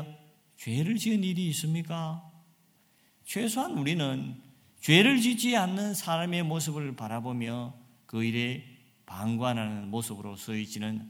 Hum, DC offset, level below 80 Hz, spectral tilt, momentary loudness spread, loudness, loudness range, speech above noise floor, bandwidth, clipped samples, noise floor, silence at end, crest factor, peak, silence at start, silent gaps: none; under 0.1%; -72 dBFS; -4.5 dB/octave; 15 LU; -29 LUFS; 7 LU; 36 dB; 18 kHz; under 0.1%; -65 dBFS; 0 s; 26 dB; -6 dBFS; 0 s; none